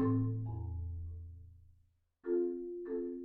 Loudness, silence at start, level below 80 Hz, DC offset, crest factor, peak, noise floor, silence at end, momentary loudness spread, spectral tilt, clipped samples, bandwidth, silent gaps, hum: -39 LUFS; 0 s; -52 dBFS; under 0.1%; 16 dB; -22 dBFS; -71 dBFS; 0 s; 17 LU; -13 dB/octave; under 0.1%; 2.3 kHz; none; none